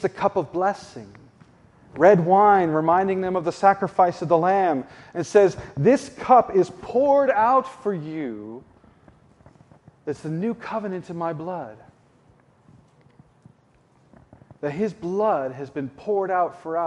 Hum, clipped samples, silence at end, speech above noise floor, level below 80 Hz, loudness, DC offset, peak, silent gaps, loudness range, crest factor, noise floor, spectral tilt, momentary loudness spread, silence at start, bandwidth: none; under 0.1%; 0 s; 38 dB; -60 dBFS; -21 LUFS; under 0.1%; -2 dBFS; none; 14 LU; 20 dB; -59 dBFS; -7 dB/octave; 16 LU; 0 s; 11 kHz